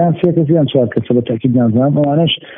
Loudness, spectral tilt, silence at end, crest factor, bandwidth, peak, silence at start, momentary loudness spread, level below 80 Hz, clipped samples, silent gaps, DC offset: -13 LUFS; -6.5 dB/octave; 0 s; 12 dB; 3.8 kHz; 0 dBFS; 0 s; 3 LU; -50 dBFS; under 0.1%; none; under 0.1%